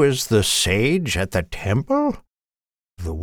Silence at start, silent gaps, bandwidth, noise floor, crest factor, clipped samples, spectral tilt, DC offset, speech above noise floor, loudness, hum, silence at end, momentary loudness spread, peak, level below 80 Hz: 0 s; none; 19.5 kHz; under -90 dBFS; 16 dB; under 0.1%; -4.5 dB/octave; under 0.1%; over 70 dB; -20 LUFS; none; 0 s; 12 LU; -4 dBFS; -38 dBFS